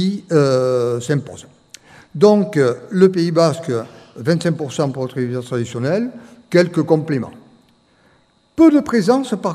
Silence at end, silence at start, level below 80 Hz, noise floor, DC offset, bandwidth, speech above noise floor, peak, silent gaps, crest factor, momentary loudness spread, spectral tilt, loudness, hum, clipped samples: 0 s; 0 s; -58 dBFS; -56 dBFS; under 0.1%; 13.5 kHz; 40 dB; 0 dBFS; none; 18 dB; 11 LU; -7 dB/octave; -17 LUFS; none; under 0.1%